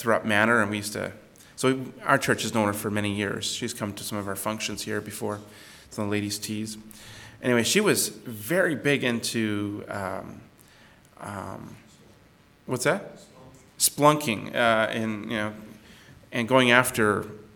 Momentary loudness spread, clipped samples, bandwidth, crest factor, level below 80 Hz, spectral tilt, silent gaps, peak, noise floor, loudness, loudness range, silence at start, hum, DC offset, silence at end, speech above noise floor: 17 LU; under 0.1%; 19 kHz; 26 dB; -62 dBFS; -3.5 dB/octave; none; -2 dBFS; -57 dBFS; -25 LUFS; 9 LU; 0 s; none; under 0.1%; 0.1 s; 31 dB